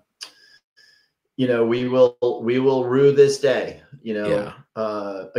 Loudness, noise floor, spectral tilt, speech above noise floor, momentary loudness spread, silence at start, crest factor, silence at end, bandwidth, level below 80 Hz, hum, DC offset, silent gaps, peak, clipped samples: -20 LUFS; -61 dBFS; -6 dB/octave; 41 dB; 20 LU; 0.2 s; 18 dB; 0 s; 11.5 kHz; -64 dBFS; none; under 0.1%; 0.64-0.76 s; -4 dBFS; under 0.1%